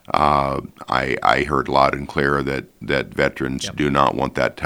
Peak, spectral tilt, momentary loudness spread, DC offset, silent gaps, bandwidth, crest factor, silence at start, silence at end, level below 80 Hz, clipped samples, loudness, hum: 0 dBFS; -5.5 dB/octave; 7 LU; under 0.1%; none; over 20 kHz; 20 dB; 0.15 s; 0 s; -40 dBFS; under 0.1%; -20 LUFS; none